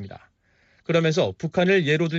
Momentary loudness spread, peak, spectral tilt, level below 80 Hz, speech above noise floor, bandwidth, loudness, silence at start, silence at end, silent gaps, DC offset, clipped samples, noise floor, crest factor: 15 LU; -8 dBFS; -5 dB/octave; -62 dBFS; 42 dB; 7.8 kHz; -22 LUFS; 0 s; 0 s; none; under 0.1%; under 0.1%; -63 dBFS; 14 dB